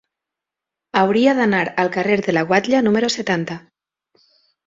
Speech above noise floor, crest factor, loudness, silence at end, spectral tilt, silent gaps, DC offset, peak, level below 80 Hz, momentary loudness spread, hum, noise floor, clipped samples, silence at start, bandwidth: 68 dB; 18 dB; -17 LUFS; 1.1 s; -5 dB/octave; none; under 0.1%; -2 dBFS; -60 dBFS; 8 LU; none; -85 dBFS; under 0.1%; 0.95 s; 7.8 kHz